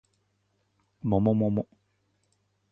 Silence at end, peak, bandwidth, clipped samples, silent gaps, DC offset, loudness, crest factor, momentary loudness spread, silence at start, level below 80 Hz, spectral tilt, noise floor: 1.1 s; -10 dBFS; 3.7 kHz; under 0.1%; none; under 0.1%; -27 LUFS; 20 dB; 12 LU; 1.05 s; -54 dBFS; -11.5 dB/octave; -73 dBFS